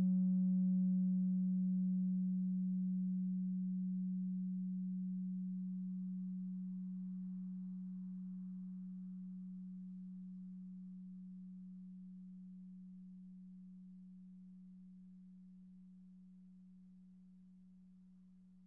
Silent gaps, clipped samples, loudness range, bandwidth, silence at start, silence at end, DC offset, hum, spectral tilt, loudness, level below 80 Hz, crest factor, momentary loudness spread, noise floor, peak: none; under 0.1%; 22 LU; 0.6 kHz; 0 s; 0 s; under 0.1%; none; -18 dB/octave; -41 LUFS; -86 dBFS; 12 dB; 24 LU; -63 dBFS; -30 dBFS